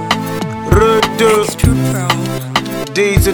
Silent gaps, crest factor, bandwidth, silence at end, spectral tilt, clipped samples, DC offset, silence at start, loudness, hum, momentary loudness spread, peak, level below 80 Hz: none; 14 dB; 19.5 kHz; 0 s; -5 dB/octave; 0.2%; 0.4%; 0 s; -13 LUFS; none; 7 LU; 0 dBFS; -26 dBFS